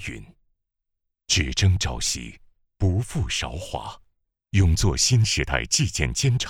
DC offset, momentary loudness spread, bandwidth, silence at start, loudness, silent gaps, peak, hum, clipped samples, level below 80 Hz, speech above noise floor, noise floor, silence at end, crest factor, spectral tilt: under 0.1%; 14 LU; 16 kHz; 0 s; -23 LUFS; none; -2 dBFS; none; under 0.1%; -34 dBFS; 58 dB; -80 dBFS; 0 s; 22 dB; -3.5 dB/octave